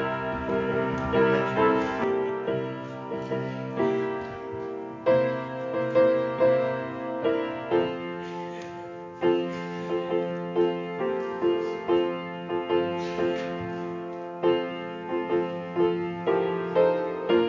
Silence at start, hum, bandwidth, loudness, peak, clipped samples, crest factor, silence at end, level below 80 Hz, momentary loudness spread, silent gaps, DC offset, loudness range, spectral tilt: 0 s; none; 7.4 kHz; -27 LUFS; -10 dBFS; under 0.1%; 18 dB; 0 s; -56 dBFS; 11 LU; none; under 0.1%; 4 LU; -7.5 dB/octave